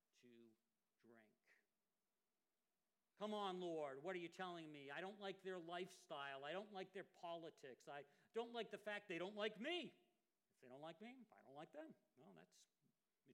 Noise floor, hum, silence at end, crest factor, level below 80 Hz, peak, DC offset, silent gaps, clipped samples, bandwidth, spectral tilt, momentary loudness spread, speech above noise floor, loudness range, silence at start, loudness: under -90 dBFS; none; 0 s; 22 dB; under -90 dBFS; -32 dBFS; under 0.1%; none; under 0.1%; 13 kHz; -4.5 dB/octave; 14 LU; over 37 dB; 5 LU; 0.25 s; -53 LUFS